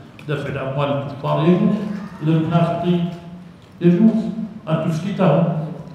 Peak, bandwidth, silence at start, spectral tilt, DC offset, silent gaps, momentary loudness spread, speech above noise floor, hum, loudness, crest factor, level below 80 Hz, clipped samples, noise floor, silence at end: -2 dBFS; 8.2 kHz; 0 s; -9 dB/octave; under 0.1%; none; 11 LU; 21 dB; none; -19 LUFS; 16 dB; -54 dBFS; under 0.1%; -39 dBFS; 0 s